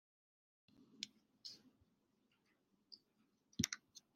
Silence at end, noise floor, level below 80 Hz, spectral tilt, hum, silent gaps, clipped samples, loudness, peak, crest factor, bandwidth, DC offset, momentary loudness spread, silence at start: 0.15 s; -81 dBFS; -78 dBFS; -2 dB/octave; none; none; under 0.1%; -48 LUFS; -18 dBFS; 36 dB; 15.5 kHz; under 0.1%; 20 LU; 0.8 s